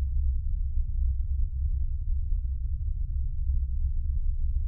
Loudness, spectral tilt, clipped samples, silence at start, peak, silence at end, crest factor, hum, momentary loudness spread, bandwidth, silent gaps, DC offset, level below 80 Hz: -32 LUFS; -12.5 dB/octave; under 0.1%; 0 s; -16 dBFS; 0 s; 10 dB; none; 3 LU; 0.3 kHz; none; under 0.1%; -28 dBFS